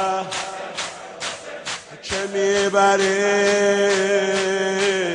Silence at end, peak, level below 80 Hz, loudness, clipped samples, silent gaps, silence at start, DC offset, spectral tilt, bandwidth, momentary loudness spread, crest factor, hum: 0 s; -4 dBFS; -58 dBFS; -20 LUFS; under 0.1%; none; 0 s; under 0.1%; -3 dB/octave; 11 kHz; 13 LU; 16 dB; none